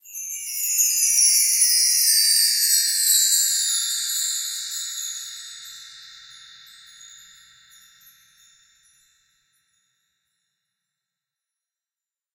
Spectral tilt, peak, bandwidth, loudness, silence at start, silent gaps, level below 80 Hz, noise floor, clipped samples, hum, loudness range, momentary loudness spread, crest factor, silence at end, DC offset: 7.5 dB/octave; -4 dBFS; 16 kHz; -17 LUFS; 0.05 s; none; -78 dBFS; under -90 dBFS; under 0.1%; none; 19 LU; 19 LU; 20 dB; 5.2 s; under 0.1%